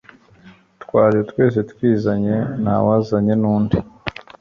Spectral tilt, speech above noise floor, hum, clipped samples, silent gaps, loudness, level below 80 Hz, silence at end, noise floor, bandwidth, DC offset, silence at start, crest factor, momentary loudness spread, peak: -9.5 dB/octave; 31 dB; none; under 0.1%; none; -18 LUFS; -44 dBFS; 0.3 s; -47 dBFS; 6.6 kHz; under 0.1%; 0.45 s; 16 dB; 6 LU; -2 dBFS